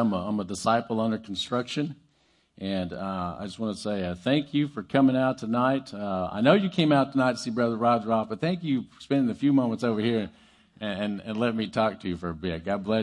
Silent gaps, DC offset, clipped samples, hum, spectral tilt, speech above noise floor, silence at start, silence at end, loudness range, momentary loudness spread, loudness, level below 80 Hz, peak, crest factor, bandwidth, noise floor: none; under 0.1%; under 0.1%; none; -6.5 dB/octave; 40 dB; 0 s; 0 s; 6 LU; 10 LU; -27 LUFS; -62 dBFS; -4 dBFS; 22 dB; 11.5 kHz; -66 dBFS